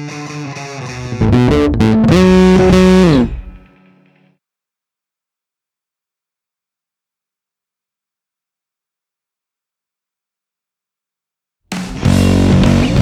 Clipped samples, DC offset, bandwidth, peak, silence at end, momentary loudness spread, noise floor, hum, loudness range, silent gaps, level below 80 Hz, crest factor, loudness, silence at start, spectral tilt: under 0.1%; under 0.1%; 13 kHz; 0 dBFS; 0 s; 17 LU; -86 dBFS; none; 12 LU; none; -28 dBFS; 14 dB; -10 LUFS; 0 s; -7 dB/octave